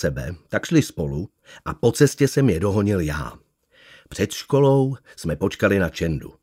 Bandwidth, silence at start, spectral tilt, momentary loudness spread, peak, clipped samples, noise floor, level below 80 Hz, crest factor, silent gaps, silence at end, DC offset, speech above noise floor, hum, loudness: 16 kHz; 0 s; -6 dB/octave; 14 LU; -4 dBFS; under 0.1%; -53 dBFS; -42 dBFS; 18 dB; none; 0.1 s; under 0.1%; 32 dB; none; -21 LUFS